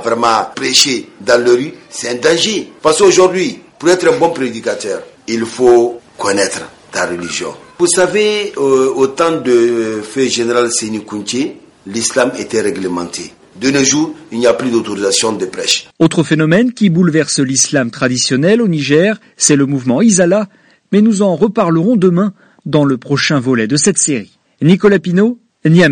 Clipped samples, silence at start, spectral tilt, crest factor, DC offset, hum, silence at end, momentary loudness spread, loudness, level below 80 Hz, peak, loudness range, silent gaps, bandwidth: under 0.1%; 0 s; -4 dB/octave; 12 dB; under 0.1%; none; 0 s; 10 LU; -13 LUFS; -52 dBFS; 0 dBFS; 4 LU; none; 11.5 kHz